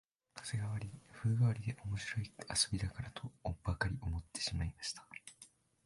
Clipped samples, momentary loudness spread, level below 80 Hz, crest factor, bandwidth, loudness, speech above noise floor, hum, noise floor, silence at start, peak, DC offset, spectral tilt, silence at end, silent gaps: under 0.1%; 17 LU; -52 dBFS; 22 dB; 11.5 kHz; -39 LUFS; 25 dB; none; -64 dBFS; 0.35 s; -18 dBFS; under 0.1%; -4 dB/octave; 0.4 s; none